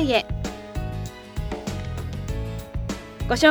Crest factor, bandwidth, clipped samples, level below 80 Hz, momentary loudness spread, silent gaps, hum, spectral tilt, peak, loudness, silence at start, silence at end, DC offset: 20 dB; over 20 kHz; under 0.1%; -34 dBFS; 10 LU; none; none; -5 dB/octave; -4 dBFS; -29 LUFS; 0 s; 0 s; under 0.1%